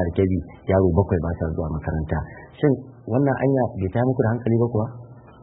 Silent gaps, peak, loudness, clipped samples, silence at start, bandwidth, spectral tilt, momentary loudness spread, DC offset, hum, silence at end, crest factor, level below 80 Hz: none; -4 dBFS; -23 LUFS; under 0.1%; 0 s; 3.9 kHz; -13.5 dB/octave; 8 LU; under 0.1%; none; 0.25 s; 18 dB; -38 dBFS